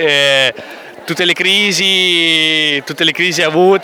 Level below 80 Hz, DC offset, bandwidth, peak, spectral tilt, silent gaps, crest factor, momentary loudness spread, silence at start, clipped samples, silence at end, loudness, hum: -64 dBFS; under 0.1%; 18.5 kHz; 0 dBFS; -2.5 dB/octave; none; 12 dB; 10 LU; 0 s; under 0.1%; 0 s; -11 LUFS; none